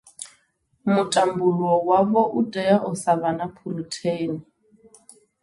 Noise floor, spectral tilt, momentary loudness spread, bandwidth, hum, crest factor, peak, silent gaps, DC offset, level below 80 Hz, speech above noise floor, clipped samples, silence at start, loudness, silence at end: -66 dBFS; -5.5 dB/octave; 13 LU; 11.5 kHz; none; 18 dB; -4 dBFS; none; under 0.1%; -64 dBFS; 44 dB; under 0.1%; 0.2 s; -22 LUFS; 1 s